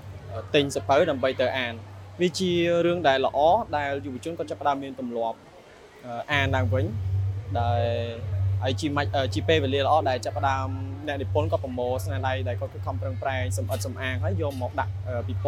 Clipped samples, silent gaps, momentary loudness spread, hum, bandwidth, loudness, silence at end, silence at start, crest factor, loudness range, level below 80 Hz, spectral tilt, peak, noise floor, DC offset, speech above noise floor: under 0.1%; none; 10 LU; none; 14 kHz; -26 LUFS; 0 s; 0 s; 18 dB; 5 LU; -50 dBFS; -6 dB/octave; -8 dBFS; -49 dBFS; under 0.1%; 23 dB